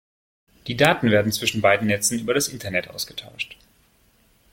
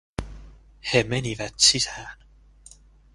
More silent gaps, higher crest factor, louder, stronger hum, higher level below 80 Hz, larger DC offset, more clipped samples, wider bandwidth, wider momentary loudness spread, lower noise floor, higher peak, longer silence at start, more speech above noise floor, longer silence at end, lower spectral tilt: neither; about the same, 22 dB vs 24 dB; about the same, -22 LUFS vs -21 LUFS; neither; second, -56 dBFS vs -46 dBFS; neither; neither; first, 16.5 kHz vs 11.5 kHz; second, 14 LU vs 22 LU; first, -60 dBFS vs -52 dBFS; about the same, -2 dBFS vs -4 dBFS; first, 0.65 s vs 0.2 s; first, 38 dB vs 28 dB; about the same, 1 s vs 1 s; first, -3.5 dB/octave vs -2 dB/octave